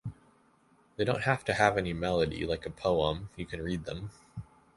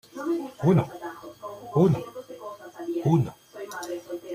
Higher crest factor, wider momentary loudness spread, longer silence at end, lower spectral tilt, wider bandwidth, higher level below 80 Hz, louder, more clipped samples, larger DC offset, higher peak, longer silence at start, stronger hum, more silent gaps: about the same, 24 dB vs 20 dB; about the same, 19 LU vs 18 LU; first, 0.35 s vs 0 s; second, -5.5 dB/octave vs -8 dB/octave; second, 11.5 kHz vs 15 kHz; first, -50 dBFS vs -62 dBFS; second, -31 LUFS vs -26 LUFS; neither; neither; about the same, -8 dBFS vs -8 dBFS; about the same, 0.05 s vs 0.15 s; neither; neither